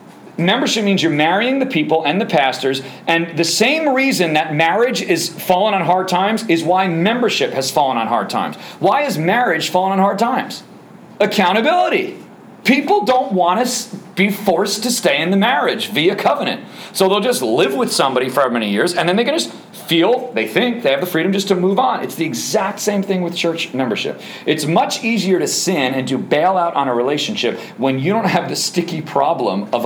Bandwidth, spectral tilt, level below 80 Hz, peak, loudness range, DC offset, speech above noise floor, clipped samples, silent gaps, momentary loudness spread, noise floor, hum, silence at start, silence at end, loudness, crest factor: over 20 kHz; -4 dB/octave; -66 dBFS; 0 dBFS; 2 LU; under 0.1%; 23 dB; under 0.1%; none; 6 LU; -39 dBFS; none; 0 s; 0 s; -16 LUFS; 16 dB